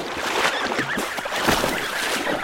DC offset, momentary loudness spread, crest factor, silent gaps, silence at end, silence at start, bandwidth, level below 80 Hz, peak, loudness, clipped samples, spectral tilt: under 0.1%; 4 LU; 20 dB; none; 0 s; 0 s; 17 kHz; -46 dBFS; -4 dBFS; -22 LUFS; under 0.1%; -2.5 dB/octave